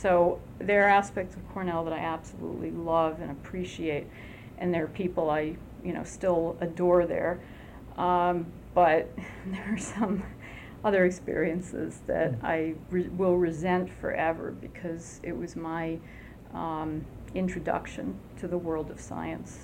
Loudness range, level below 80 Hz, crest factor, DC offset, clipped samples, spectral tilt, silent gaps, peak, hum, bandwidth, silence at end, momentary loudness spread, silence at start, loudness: 7 LU; -50 dBFS; 18 dB; under 0.1%; under 0.1%; -6.5 dB/octave; none; -10 dBFS; none; 16 kHz; 0 s; 14 LU; 0 s; -30 LUFS